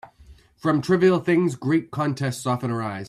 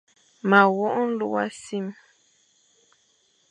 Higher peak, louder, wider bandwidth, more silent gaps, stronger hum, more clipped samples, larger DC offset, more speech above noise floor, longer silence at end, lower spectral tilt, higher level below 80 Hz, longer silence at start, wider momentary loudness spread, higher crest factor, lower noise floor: second, -6 dBFS vs -2 dBFS; about the same, -22 LUFS vs -23 LUFS; first, 13 kHz vs 10 kHz; neither; neither; neither; neither; second, 29 dB vs 43 dB; second, 0 s vs 1.6 s; about the same, -7 dB/octave vs -6 dB/octave; first, -58 dBFS vs -80 dBFS; second, 0.05 s vs 0.45 s; second, 8 LU vs 15 LU; second, 16 dB vs 24 dB; second, -51 dBFS vs -65 dBFS